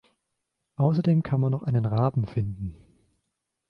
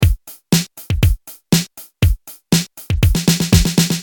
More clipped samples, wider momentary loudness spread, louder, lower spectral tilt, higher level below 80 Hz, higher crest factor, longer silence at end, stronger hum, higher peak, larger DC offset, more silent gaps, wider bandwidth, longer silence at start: neither; about the same, 13 LU vs 11 LU; second, -25 LUFS vs -17 LUFS; first, -11 dB/octave vs -4.5 dB/octave; second, -52 dBFS vs -22 dBFS; about the same, 18 dB vs 16 dB; first, 0.95 s vs 0 s; neither; second, -10 dBFS vs 0 dBFS; neither; neither; second, 5.6 kHz vs 19.5 kHz; first, 0.8 s vs 0 s